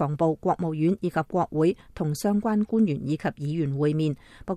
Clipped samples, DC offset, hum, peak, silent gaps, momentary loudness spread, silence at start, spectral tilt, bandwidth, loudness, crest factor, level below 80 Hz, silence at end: under 0.1%; under 0.1%; none; -12 dBFS; none; 5 LU; 0 s; -8 dB/octave; 14 kHz; -26 LUFS; 14 dB; -54 dBFS; 0 s